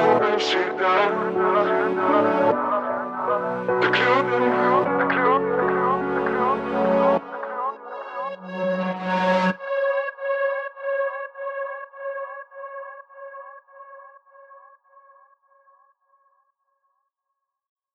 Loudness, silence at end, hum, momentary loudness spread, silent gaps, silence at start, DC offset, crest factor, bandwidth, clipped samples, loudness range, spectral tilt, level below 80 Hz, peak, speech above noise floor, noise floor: -22 LUFS; 3.35 s; none; 16 LU; none; 0 s; under 0.1%; 18 dB; 8.2 kHz; under 0.1%; 15 LU; -6 dB/octave; -62 dBFS; -6 dBFS; 61 dB; -81 dBFS